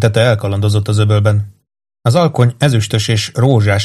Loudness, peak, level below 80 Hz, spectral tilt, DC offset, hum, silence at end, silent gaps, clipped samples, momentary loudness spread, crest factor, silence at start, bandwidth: -13 LUFS; 0 dBFS; -46 dBFS; -6 dB/octave; under 0.1%; none; 0 s; none; under 0.1%; 4 LU; 12 dB; 0 s; 12.5 kHz